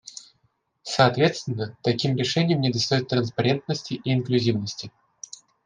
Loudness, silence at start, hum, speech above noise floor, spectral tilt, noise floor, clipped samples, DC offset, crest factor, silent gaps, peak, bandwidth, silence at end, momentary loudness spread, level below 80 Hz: -24 LUFS; 0.05 s; none; 46 dB; -5.5 dB/octave; -69 dBFS; under 0.1%; under 0.1%; 20 dB; none; -4 dBFS; 9.6 kHz; 0.75 s; 20 LU; -62 dBFS